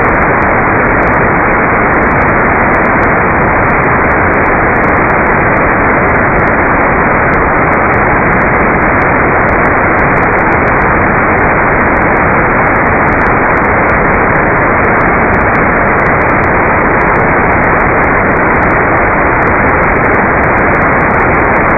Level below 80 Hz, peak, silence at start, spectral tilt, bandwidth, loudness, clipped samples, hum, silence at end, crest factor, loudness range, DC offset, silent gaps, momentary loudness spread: -22 dBFS; 0 dBFS; 0 s; -10.5 dB/octave; 7 kHz; -8 LUFS; under 0.1%; none; 0 s; 8 dB; 0 LU; under 0.1%; none; 0 LU